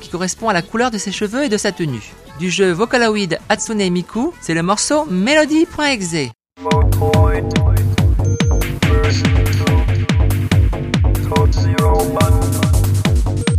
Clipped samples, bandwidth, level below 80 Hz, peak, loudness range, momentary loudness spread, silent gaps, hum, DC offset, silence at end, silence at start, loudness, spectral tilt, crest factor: under 0.1%; 15.5 kHz; -22 dBFS; -2 dBFS; 2 LU; 6 LU; none; none; under 0.1%; 0 s; 0 s; -16 LUFS; -5.5 dB/octave; 14 dB